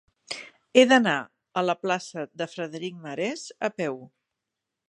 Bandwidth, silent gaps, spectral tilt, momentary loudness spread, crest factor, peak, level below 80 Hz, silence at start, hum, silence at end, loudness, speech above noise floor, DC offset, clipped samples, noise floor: 11 kHz; none; -4 dB/octave; 18 LU; 24 dB; -2 dBFS; -78 dBFS; 0.3 s; none; 0.8 s; -25 LUFS; 60 dB; under 0.1%; under 0.1%; -85 dBFS